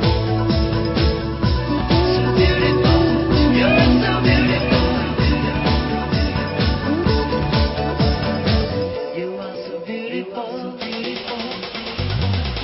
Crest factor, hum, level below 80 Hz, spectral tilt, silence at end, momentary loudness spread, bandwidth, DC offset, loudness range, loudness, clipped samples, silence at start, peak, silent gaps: 16 dB; none; -26 dBFS; -10 dB/octave; 0 s; 11 LU; 5.8 kHz; under 0.1%; 9 LU; -19 LUFS; under 0.1%; 0 s; -2 dBFS; none